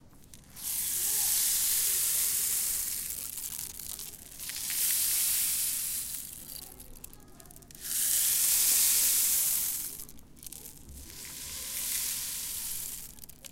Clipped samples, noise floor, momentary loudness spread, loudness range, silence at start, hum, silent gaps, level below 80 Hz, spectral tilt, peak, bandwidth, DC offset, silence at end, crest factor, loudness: under 0.1%; -53 dBFS; 21 LU; 8 LU; 0.05 s; none; none; -56 dBFS; 1.5 dB/octave; -10 dBFS; 17 kHz; under 0.1%; 0.05 s; 22 dB; -27 LUFS